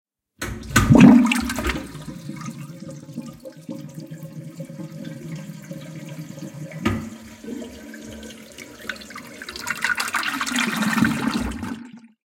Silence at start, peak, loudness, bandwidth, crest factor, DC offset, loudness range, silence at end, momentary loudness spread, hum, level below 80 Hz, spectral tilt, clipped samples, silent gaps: 0.4 s; 0 dBFS; -19 LUFS; 17 kHz; 24 dB; under 0.1%; 17 LU; 0.3 s; 18 LU; none; -42 dBFS; -5 dB/octave; under 0.1%; none